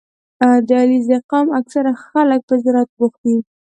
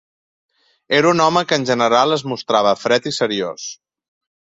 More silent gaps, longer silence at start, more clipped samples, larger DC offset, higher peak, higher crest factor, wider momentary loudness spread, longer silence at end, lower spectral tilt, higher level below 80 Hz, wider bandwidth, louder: first, 1.24-1.29 s, 2.43-2.48 s, 2.89-2.97 s, 3.18-3.24 s vs none; second, 0.4 s vs 0.9 s; neither; neither; about the same, -2 dBFS vs -2 dBFS; about the same, 14 dB vs 18 dB; second, 6 LU vs 9 LU; second, 0.3 s vs 0.7 s; first, -6.5 dB/octave vs -4 dB/octave; second, -68 dBFS vs -60 dBFS; about the same, 8.8 kHz vs 8.2 kHz; about the same, -15 LUFS vs -17 LUFS